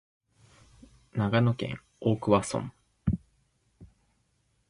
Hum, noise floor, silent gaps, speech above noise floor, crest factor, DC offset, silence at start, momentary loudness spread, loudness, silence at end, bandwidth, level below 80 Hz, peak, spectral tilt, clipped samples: none; -72 dBFS; none; 45 dB; 22 dB; under 0.1%; 1.15 s; 12 LU; -29 LUFS; 0.85 s; 11.5 kHz; -50 dBFS; -10 dBFS; -6.5 dB/octave; under 0.1%